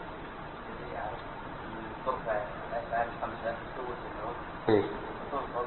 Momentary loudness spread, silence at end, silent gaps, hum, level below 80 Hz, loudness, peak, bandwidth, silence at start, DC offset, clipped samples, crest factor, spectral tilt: 13 LU; 0 s; none; none; -52 dBFS; -35 LUFS; -12 dBFS; 4.2 kHz; 0 s; under 0.1%; under 0.1%; 24 dB; -4.5 dB/octave